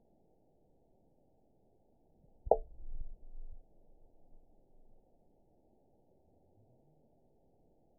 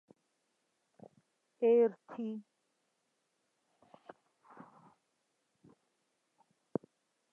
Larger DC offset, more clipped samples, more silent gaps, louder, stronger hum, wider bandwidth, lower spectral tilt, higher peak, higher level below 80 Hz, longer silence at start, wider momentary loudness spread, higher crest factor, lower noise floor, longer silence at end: neither; neither; neither; about the same, -34 LUFS vs -34 LUFS; neither; second, 1 kHz vs 3.3 kHz; second, 6.5 dB/octave vs -8.5 dB/octave; first, -10 dBFS vs -18 dBFS; first, -52 dBFS vs under -90 dBFS; first, 2.45 s vs 1.6 s; second, 24 LU vs 29 LU; first, 36 dB vs 22 dB; second, -72 dBFS vs -82 dBFS; second, 3.15 s vs 4.9 s